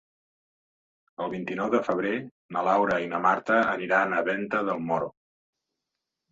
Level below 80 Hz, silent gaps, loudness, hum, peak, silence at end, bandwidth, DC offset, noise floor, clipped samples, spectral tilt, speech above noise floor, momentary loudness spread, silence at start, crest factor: -66 dBFS; 2.31-2.49 s; -26 LUFS; none; -8 dBFS; 1.2 s; 7.8 kHz; under 0.1%; -85 dBFS; under 0.1%; -6.5 dB/octave; 59 dB; 10 LU; 1.2 s; 20 dB